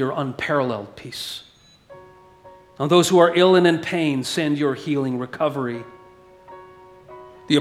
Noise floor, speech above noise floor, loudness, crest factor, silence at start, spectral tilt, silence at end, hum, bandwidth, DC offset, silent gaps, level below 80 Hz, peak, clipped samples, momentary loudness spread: -48 dBFS; 28 dB; -20 LUFS; 20 dB; 0 s; -5 dB/octave; 0 s; none; 14 kHz; under 0.1%; none; -62 dBFS; -2 dBFS; under 0.1%; 17 LU